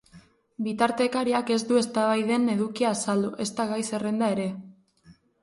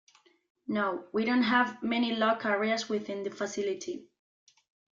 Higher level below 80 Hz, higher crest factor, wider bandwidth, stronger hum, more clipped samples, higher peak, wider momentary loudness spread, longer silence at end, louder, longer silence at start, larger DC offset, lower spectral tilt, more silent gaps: first, -68 dBFS vs -76 dBFS; about the same, 20 dB vs 18 dB; first, 11.5 kHz vs 7.6 kHz; neither; neither; first, -6 dBFS vs -12 dBFS; second, 6 LU vs 11 LU; second, 0.3 s vs 0.9 s; first, -26 LUFS vs -30 LUFS; second, 0.15 s vs 0.7 s; neither; about the same, -4.5 dB/octave vs -4 dB/octave; neither